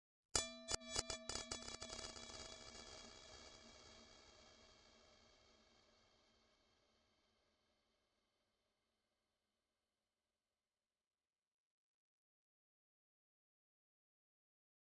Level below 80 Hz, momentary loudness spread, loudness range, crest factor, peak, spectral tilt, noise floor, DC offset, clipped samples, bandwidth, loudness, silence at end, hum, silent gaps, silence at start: -70 dBFS; 24 LU; 20 LU; 36 dB; -20 dBFS; -1 dB/octave; under -90 dBFS; under 0.1%; under 0.1%; 10.5 kHz; -48 LUFS; 8.7 s; none; none; 0.35 s